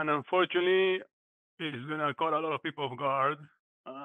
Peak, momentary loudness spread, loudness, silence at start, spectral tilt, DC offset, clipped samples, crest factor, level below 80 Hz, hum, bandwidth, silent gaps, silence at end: -16 dBFS; 12 LU; -30 LUFS; 0 s; -7 dB/octave; under 0.1%; under 0.1%; 16 dB; -90 dBFS; none; 4 kHz; 1.13-1.58 s, 3.59-3.84 s; 0 s